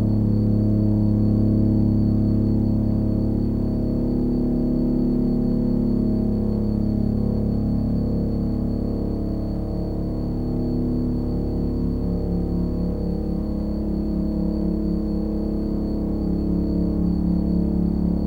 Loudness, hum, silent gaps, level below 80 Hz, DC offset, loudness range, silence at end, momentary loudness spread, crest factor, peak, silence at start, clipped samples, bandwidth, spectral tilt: -23 LUFS; 60 Hz at -35 dBFS; none; -28 dBFS; under 0.1%; 4 LU; 0 s; 6 LU; 12 dB; -8 dBFS; 0 s; under 0.1%; 4.8 kHz; -11 dB/octave